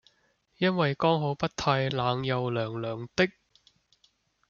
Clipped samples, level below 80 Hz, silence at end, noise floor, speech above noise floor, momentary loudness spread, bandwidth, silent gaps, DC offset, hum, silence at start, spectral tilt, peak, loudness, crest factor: under 0.1%; -60 dBFS; 1.2 s; -70 dBFS; 42 dB; 6 LU; 7.2 kHz; none; under 0.1%; none; 0.6 s; -6 dB/octave; -10 dBFS; -28 LUFS; 20 dB